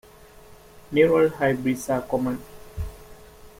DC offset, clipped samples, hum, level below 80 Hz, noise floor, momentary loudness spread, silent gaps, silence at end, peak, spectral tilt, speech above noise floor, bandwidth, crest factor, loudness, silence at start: under 0.1%; under 0.1%; none; -46 dBFS; -48 dBFS; 18 LU; none; 0.1 s; -6 dBFS; -6 dB/octave; 26 dB; 16.5 kHz; 20 dB; -23 LUFS; 0.75 s